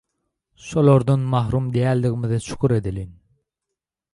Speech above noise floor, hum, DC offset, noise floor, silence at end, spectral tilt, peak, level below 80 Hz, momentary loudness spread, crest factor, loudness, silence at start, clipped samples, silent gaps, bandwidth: 65 dB; none; under 0.1%; -84 dBFS; 1 s; -8 dB/octave; -4 dBFS; -44 dBFS; 15 LU; 16 dB; -20 LUFS; 0.65 s; under 0.1%; none; 11.5 kHz